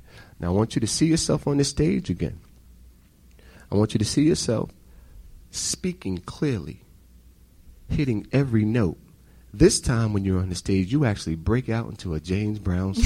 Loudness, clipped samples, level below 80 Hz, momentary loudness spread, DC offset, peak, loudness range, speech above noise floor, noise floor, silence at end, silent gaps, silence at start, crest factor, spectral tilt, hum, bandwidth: -24 LUFS; under 0.1%; -42 dBFS; 11 LU; under 0.1%; -4 dBFS; 6 LU; 30 dB; -53 dBFS; 0 s; none; 0.15 s; 20 dB; -5.5 dB/octave; none; 15 kHz